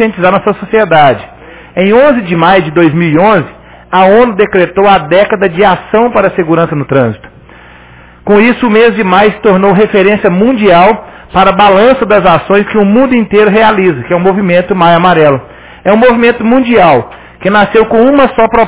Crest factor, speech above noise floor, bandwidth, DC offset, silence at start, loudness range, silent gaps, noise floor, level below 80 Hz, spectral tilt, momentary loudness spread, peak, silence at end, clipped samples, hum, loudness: 6 dB; 29 dB; 4 kHz; under 0.1%; 0 s; 3 LU; none; -35 dBFS; -36 dBFS; -10 dB/octave; 5 LU; 0 dBFS; 0 s; 3%; none; -7 LUFS